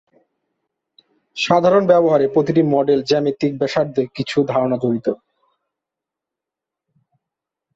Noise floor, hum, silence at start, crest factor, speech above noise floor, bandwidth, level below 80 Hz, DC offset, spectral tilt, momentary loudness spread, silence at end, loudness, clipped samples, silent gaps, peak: -85 dBFS; none; 1.35 s; 18 dB; 69 dB; 8 kHz; -60 dBFS; under 0.1%; -6.5 dB/octave; 9 LU; 2.6 s; -17 LUFS; under 0.1%; none; -2 dBFS